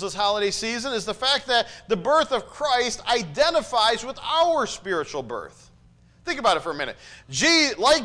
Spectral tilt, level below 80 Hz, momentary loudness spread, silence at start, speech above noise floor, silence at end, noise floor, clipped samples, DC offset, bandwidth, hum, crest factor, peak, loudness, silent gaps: -2 dB/octave; -52 dBFS; 12 LU; 0 s; 31 dB; 0 s; -54 dBFS; under 0.1%; under 0.1%; 10.5 kHz; none; 16 dB; -8 dBFS; -22 LUFS; none